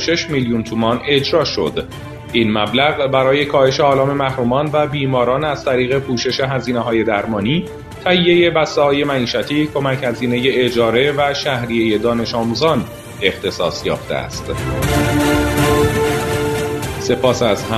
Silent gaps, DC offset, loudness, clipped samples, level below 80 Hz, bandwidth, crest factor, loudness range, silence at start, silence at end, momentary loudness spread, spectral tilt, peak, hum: none; under 0.1%; -16 LUFS; under 0.1%; -36 dBFS; 14 kHz; 16 dB; 3 LU; 0 s; 0 s; 7 LU; -5 dB/octave; 0 dBFS; none